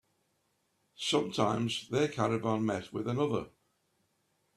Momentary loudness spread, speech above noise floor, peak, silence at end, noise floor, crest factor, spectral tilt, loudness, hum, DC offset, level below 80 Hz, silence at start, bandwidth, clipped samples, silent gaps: 6 LU; 45 dB; -12 dBFS; 1.1 s; -77 dBFS; 22 dB; -5.5 dB/octave; -32 LUFS; none; under 0.1%; -70 dBFS; 1 s; 13 kHz; under 0.1%; none